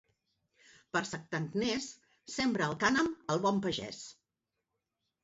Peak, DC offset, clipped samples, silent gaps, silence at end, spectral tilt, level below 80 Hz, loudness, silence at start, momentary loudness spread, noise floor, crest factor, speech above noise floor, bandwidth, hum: -16 dBFS; under 0.1%; under 0.1%; none; 1.1 s; -3.5 dB/octave; -68 dBFS; -33 LUFS; 0.95 s; 15 LU; -88 dBFS; 20 dB; 54 dB; 8 kHz; none